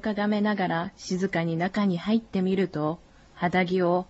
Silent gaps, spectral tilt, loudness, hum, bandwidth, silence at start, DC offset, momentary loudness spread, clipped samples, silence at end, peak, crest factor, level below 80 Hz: none; -7 dB/octave; -26 LUFS; none; 8 kHz; 0 s; under 0.1%; 7 LU; under 0.1%; 0.05 s; -12 dBFS; 14 dB; -58 dBFS